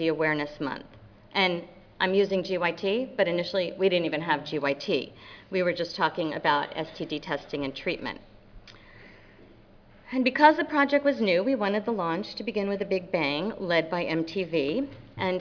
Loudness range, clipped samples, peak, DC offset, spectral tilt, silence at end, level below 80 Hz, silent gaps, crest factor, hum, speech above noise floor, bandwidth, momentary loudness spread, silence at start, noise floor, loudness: 7 LU; under 0.1%; -6 dBFS; under 0.1%; -6 dB/octave; 0 s; -60 dBFS; none; 22 dB; none; 27 dB; 5.4 kHz; 10 LU; 0 s; -54 dBFS; -27 LUFS